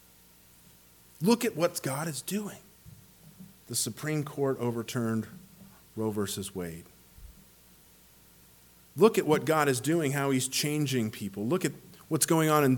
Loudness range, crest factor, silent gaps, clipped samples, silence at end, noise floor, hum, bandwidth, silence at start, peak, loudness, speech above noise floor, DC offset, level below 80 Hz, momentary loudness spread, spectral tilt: 10 LU; 22 dB; none; under 0.1%; 0 s; -58 dBFS; none; 19 kHz; 1.2 s; -10 dBFS; -29 LUFS; 30 dB; under 0.1%; -64 dBFS; 15 LU; -4.5 dB/octave